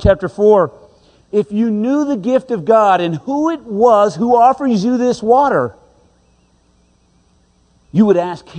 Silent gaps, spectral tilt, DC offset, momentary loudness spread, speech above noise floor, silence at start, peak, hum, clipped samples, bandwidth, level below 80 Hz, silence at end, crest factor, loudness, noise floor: none; -7 dB/octave; under 0.1%; 8 LU; 41 dB; 0 s; 0 dBFS; none; under 0.1%; 9.4 kHz; -38 dBFS; 0 s; 14 dB; -14 LUFS; -55 dBFS